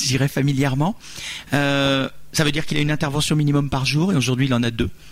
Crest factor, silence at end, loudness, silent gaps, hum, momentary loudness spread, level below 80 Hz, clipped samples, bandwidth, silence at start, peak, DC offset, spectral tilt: 14 dB; 0 s; -20 LUFS; none; none; 6 LU; -42 dBFS; under 0.1%; 16 kHz; 0 s; -6 dBFS; under 0.1%; -5 dB/octave